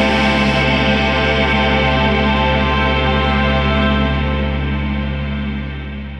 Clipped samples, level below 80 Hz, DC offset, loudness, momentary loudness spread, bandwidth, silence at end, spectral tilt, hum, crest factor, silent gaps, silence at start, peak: under 0.1%; -22 dBFS; under 0.1%; -15 LUFS; 8 LU; 8.8 kHz; 0 s; -6.5 dB/octave; none; 12 dB; none; 0 s; -2 dBFS